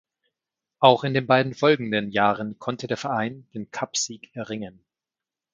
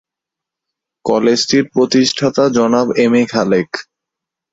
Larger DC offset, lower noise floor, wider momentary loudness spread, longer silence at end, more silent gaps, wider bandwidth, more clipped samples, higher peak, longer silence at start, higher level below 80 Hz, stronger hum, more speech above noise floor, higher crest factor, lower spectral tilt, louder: neither; first, -89 dBFS vs -84 dBFS; first, 16 LU vs 5 LU; first, 0.85 s vs 0.7 s; neither; first, 9.6 kHz vs 8 kHz; neither; about the same, 0 dBFS vs 0 dBFS; second, 0.8 s vs 1.05 s; second, -66 dBFS vs -56 dBFS; neither; second, 66 dB vs 71 dB; first, 24 dB vs 14 dB; about the same, -4.5 dB/octave vs -4.5 dB/octave; second, -23 LUFS vs -13 LUFS